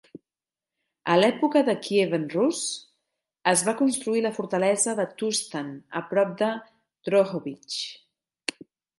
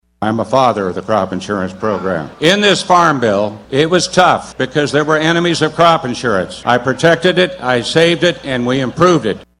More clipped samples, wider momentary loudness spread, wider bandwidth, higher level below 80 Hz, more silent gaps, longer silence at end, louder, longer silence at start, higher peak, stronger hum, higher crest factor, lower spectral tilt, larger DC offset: second, under 0.1% vs 0.1%; first, 13 LU vs 8 LU; about the same, 12 kHz vs 12.5 kHz; second, -76 dBFS vs -46 dBFS; neither; first, 1 s vs 0.15 s; second, -25 LUFS vs -13 LUFS; first, 1.05 s vs 0.2 s; second, -4 dBFS vs 0 dBFS; neither; first, 22 dB vs 14 dB; about the same, -3.5 dB/octave vs -4.5 dB/octave; neither